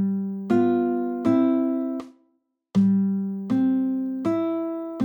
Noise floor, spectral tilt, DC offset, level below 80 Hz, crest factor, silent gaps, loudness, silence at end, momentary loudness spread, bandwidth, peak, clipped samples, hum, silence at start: -70 dBFS; -9.5 dB/octave; under 0.1%; -68 dBFS; 14 dB; none; -24 LUFS; 0 s; 8 LU; 18.5 kHz; -8 dBFS; under 0.1%; none; 0 s